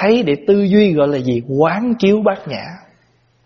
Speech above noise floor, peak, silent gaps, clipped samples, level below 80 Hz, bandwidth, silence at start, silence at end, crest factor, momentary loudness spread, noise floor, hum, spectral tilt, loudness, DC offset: 42 dB; 0 dBFS; none; under 0.1%; -52 dBFS; 6.4 kHz; 0 s; 0.7 s; 14 dB; 13 LU; -56 dBFS; none; -6 dB/octave; -15 LUFS; under 0.1%